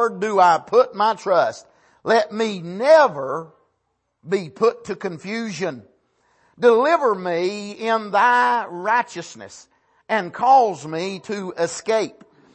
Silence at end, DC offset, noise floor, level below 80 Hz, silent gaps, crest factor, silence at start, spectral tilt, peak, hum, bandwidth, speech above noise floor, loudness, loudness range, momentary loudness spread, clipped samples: 0.45 s; under 0.1%; -72 dBFS; -70 dBFS; none; 18 dB; 0 s; -4.5 dB/octave; -4 dBFS; none; 8.8 kHz; 53 dB; -20 LUFS; 4 LU; 14 LU; under 0.1%